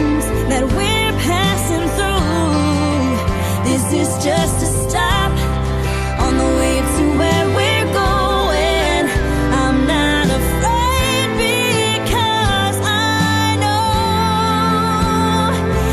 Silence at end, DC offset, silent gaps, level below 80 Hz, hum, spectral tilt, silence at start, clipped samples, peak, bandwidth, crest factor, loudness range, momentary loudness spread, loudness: 0 s; under 0.1%; none; -24 dBFS; none; -4.5 dB/octave; 0 s; under 0.1%; -4 dBFS; 14.5 kHz; 10 dB; 1 LU; 3 LU; -16 LUFS